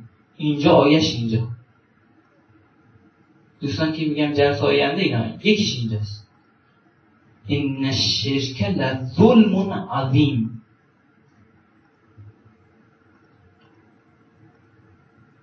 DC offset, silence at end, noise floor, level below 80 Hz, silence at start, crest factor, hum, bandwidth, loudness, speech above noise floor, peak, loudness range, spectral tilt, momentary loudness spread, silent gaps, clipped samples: under 0.1%; 3.1 s; -58 dBFS; -56 dBFS; 0 s; 22 dB; none; 6.8 kHz; -20 LUFS; 39 dB; -2 dBFS; 7 LU; -6 dB/octave; 14 LU; none; under 0.1%